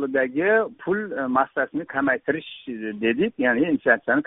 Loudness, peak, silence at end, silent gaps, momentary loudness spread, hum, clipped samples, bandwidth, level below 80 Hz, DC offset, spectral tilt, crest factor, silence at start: -23 LUFS; -4 dBFS; 0.05 s; none; 8 LU; none; under 0.1%; 4 kHz; -64 dBFS; under 0.1%; -3.5 dB/octave; 18 dB; 0 s